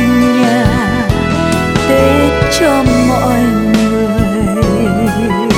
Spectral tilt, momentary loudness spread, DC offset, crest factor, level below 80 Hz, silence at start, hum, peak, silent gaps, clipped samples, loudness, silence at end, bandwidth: -6 dB/octave; 3 LU; under 0.1%; 10 dB; -24 dBFS; 0 s; none; 0 dBFS; none; under 0.1%; -11 LUFS; 0 s; 16.5 kHz